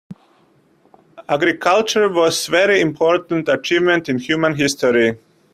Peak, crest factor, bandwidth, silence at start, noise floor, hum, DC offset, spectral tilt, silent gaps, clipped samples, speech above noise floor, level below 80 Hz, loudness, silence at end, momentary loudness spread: -2 dBFS; 16 dB; 15.5 kHz; 0.1 s; -56 dBFS; none; under 0.1%; -4 dB/octave; none; under 0.1%; 40 dB; -58 dBFS; -16 LUFS; 0.4 s; 4 LU